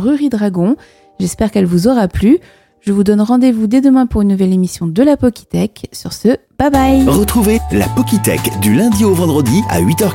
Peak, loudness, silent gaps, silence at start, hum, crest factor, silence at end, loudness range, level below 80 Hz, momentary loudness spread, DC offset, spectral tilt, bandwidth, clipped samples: 0 dBFS; -12 LUFS; none; 0 s; none; 12 dB; 0 s; 1 LU; -30 dBFS; 7 LU; under 0.1%; -6 dB/octave; 17 kHz; under 0.1%